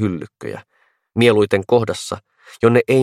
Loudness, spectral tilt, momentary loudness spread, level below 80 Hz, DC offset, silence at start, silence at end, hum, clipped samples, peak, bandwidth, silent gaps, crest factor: -17 LUFS; -6 dB/octave; 18 LU; -56 dBFS; under 0.1%; 0 s; 0 s; none; under 0.1%; 0 dBFS; 14 kHz; none; 18 dB